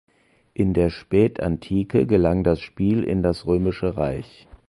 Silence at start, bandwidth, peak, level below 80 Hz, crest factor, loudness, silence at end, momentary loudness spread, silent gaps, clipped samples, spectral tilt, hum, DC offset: 0.6 s; 11.5 kHz; -6 dBFS; -38 dBFS; 16 dB; -22 LUFS; 0.45 s; 7 LU; none; under 0.1%; -9 dB/octave; none; under 0.1%